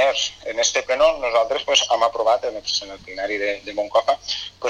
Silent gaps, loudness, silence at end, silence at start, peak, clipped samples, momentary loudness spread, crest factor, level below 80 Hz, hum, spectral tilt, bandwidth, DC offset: none; -20 LUFS; 0 s; 0 s; -2 dBFS; under 0.1%; 8 LU; 20 dB; -52 dBFS; none; 0 dB/octave; 10.5 kHz; under 0.1%